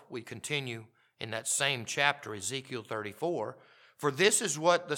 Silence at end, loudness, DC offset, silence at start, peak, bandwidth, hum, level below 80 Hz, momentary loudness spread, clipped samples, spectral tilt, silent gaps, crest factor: 0 s; -31 LUFS; under 0.1%; 0.1 s; -8 dBFS; 18 kHz; none; -82 dBFS; 15 LU; under 0.1%; -2.5 dB/octave; none; 24 dB